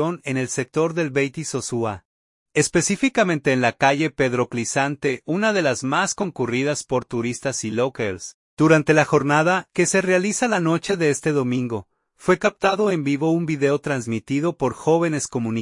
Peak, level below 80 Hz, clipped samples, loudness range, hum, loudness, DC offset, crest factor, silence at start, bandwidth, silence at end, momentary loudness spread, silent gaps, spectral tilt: -2 dBFS; -58 dBFS; under 0.1%; 3 LU; none; -21 LUFS; under 0.1%; 18 dB; 0 s; 11.5 kHz; 0 s; 8 LU; 2.05-2.46 s, 8.34-8.57 s; -5 dB/octave